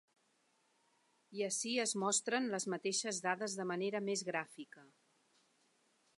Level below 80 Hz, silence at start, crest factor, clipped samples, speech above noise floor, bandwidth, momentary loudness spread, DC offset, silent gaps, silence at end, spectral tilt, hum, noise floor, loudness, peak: under -90 dBFS; 1.3 s; 20 dB; under 0.1%; 38 dB; 11.5 kHz; 11 LU; under 0.1%; none; 1.3 s; -2.5 dB/octave; none; -77 dBFS; -37 LUFS; -20 dBFS